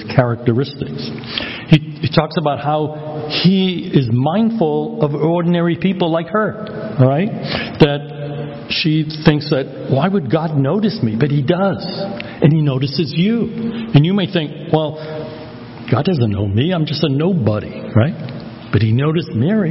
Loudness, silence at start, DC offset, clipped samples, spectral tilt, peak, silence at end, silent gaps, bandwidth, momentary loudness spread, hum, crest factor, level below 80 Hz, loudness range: -17 LUFS; 0 s; under 0.1%; under 0.1%; -9.5 dB/octave; 0 dBFS; 0 s; none; 6 kHz; 10 LU; none; 16 dB; -44 dBFS; 2 LU